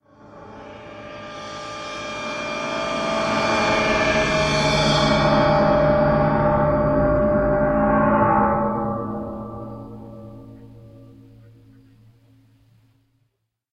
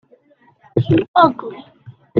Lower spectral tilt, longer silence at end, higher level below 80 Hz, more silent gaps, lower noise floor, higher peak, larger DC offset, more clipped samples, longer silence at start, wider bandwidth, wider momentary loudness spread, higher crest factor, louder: second, -5.5 dB/octave vs -9.5 dB/octave; first, 2.6 s vs 0 s; first, -38 dBFS vs -50 dBFS; second, none vs 1.08-1.14 s; first, -72 dBFS vs -54 dBFS; second, -4 dBFS vs 0 dBFS; neither; neither; second, 0.3 s vs 0.75 s; first, 11 kHz vs 5.2 kHz; about the same, 21 LU vs 19 LU; about the same, 16 dB vs 18 dB; second, -19 LUFS vs -16 LUFS